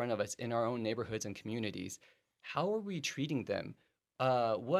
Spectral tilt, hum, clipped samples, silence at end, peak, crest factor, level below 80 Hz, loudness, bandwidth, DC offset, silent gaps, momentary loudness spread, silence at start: -5 dB/octave; none; under 0.1%; 0 s; -18 dBFS; 18 dB; -74 dBFS; -37 LUFS; 14.5 kHz; under 0.1%; none; 11 LU; 0 s